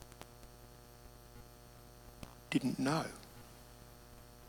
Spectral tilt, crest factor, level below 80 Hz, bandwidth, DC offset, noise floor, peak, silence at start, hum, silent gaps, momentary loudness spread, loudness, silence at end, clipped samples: -5.5 dB/octave; 24 dB; -62 dBFS; over 20 kHz; under 0.1%; -57 dBFS; -20 dBFS; 0 s; 60 Hz at -65 dBFS; none; 22 LU; -37 LUFS; 0 s; under 0.1%